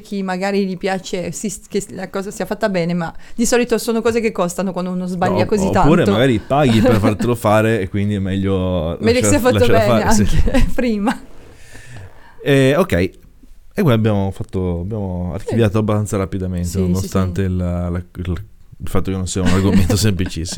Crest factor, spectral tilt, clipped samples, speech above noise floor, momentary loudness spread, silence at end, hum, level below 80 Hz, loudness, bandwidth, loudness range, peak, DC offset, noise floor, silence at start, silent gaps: 16 dB; -6 dB/octave; under 0.1%; 24 dB; 11 LU; 0 s; none; -28 dBFS; -17 LUFS; 18 kHz; 5 LU; 0 dBFS; under 0.1%; -40 dBFS; 0 s; none